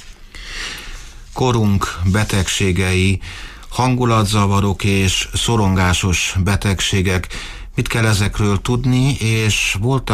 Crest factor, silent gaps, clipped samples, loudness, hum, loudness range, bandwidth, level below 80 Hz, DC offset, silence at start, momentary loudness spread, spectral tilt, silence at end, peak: 12 dB; none; under 0.1%; -17 LUFS; none; 2 LU; 15.5 kHz; -32 dBFS; under 0.1%; 0 s; 12 LU; -4.5 dB/octave; 0 s; -4 dBFS